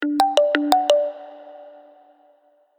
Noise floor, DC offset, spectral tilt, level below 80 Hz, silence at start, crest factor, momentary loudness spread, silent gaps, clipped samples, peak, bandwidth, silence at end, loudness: -59 dBFS; under 0.1%; -1.5 dB/octave; -78 dBFS; 0 s; 22 dB; 22 LU; none; under 0.1%; 0 dBFS; 19.5 kHz; 1.1 s; -19 LUFS